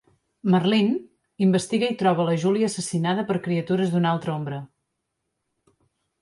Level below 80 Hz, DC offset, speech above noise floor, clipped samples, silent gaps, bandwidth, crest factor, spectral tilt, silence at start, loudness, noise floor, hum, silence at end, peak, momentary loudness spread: -66 dBFS; under 0.1%; 56 dB; under 0.1%; none; 11.5 kHz; 16 dB; -6 dB/octave; 0.45 s; -23 LUFS; -79 dBFS; none; 1.55 s; -8 dBFS; 9 LU